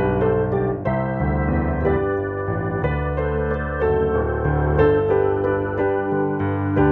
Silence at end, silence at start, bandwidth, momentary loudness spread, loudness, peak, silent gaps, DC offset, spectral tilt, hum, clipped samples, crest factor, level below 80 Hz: 0 s; 0 s; 4.3 kHz; 5 LU; -21 LUFS; -4 dBFS; none; under 0.1%; -11 dB/octave; none; under 0.1%; 16 dB; -30 dBFS